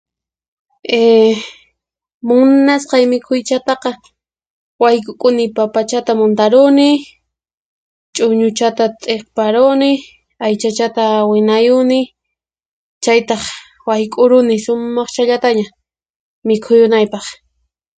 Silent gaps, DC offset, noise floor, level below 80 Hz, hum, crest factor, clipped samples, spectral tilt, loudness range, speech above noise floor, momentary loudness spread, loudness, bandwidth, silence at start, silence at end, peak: 2.14-2.21 s, 4.50-4.79 s, 7.57-8.13 s, 12.66-13.01 s, 16.10-16.42 s; under 0.1%; -78 dBFS; -60 dBFS; none; 14 dB; under 0.1%; -4.5 dB/octave; 2 LU; 66 dB; 12 LU; -13 LUFS; 9.4 kHz; 0.9 s; 0.65 s; 0 dBFS